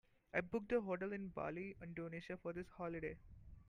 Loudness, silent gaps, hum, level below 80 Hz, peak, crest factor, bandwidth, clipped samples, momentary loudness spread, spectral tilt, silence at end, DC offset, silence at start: -45 LUFS; none; none; -66 dBFS; -24 dBFS; 22 dB; 10 kHz; under 0.1%; 9 LU; -8 dB/octave; 0.05 s; under 0.1%; 0.35 s